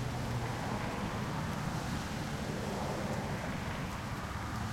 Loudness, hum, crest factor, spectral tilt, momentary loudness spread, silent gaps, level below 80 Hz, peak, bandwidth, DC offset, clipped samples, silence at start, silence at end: -37 LUFS; none; 14 dB; -5.5 dB/octave; 2 LU; none; -48 dBFS; -24 dBFS; 16.5 kHz; under 0.1%; under 0.1%; 0 s; 0 s